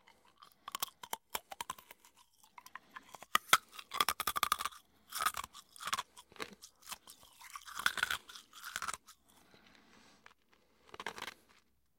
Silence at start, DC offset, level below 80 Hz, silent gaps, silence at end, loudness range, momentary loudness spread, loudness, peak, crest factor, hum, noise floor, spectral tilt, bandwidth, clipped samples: 0.4 s; under 0.1%; -72 dBFS; none; 0.7 s; 11 LU; 21 LU; -38 LUFS; -8 dBFS; 34 dB; none; -72 dBFS; 0.5 dB/octave; 17 kHz; under 0.1%